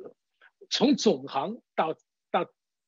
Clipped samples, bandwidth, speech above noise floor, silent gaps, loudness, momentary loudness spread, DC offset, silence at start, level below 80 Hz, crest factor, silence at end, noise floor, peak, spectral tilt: under 0.1%; 7.8 kHz; 36 dB; none; -28 LUFS; 10 LU; under 0.1%; 0 s; -80 dBFS; 20 dB; 0.4 s; -63 dBFS; -10 dBFS; -4.5 dB/octave